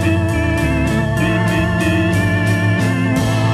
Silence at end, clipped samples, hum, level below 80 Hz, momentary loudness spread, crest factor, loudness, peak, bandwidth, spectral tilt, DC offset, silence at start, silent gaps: 0 s; under 0.1%; none; -30 dBFS; 1 LU; 10 dB; -16 LUFS; -4 dBFS; 14.5 kHz; -6.5 dB/octave; under 0.1%; 0 s; none